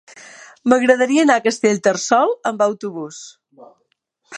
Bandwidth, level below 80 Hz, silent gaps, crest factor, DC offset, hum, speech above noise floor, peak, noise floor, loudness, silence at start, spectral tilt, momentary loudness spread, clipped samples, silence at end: 11 kHz; -70 dBFS; none; 18 dB; under 0.1%; none; 51 dB; 0 dBFS; -68 dBFS; -16 LUFS; 0.15 s; -4 dB/octave; 15 LU; under 0.1%; 0 s